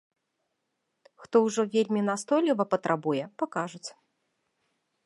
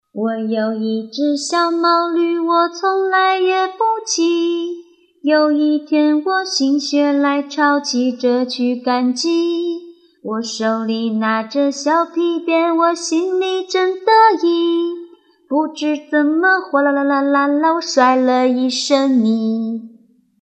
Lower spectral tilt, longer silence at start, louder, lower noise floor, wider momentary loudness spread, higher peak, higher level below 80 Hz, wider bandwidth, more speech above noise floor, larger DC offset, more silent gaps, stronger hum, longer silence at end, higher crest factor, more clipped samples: first, -5.5 dB/octave vs -3.5 dB/octave; first, 1.2 s vs 0.15 s; second, -27 LUFS vs -16 LUFS; first, -80 dBFS vs -50 dBFS; about the same, 10 LU vs 8 LU; second, -8 dBFS vs 0 dBFS; about the same, -82 dBFS vs -84 dBFS; first, 11.5 kHz vs 9.2 kHz; first, 53 dB vs 34 dB; neither; neither; neither; first, 1.15 s vs 0.55 s; first, 22 dB vs 16 dB; neither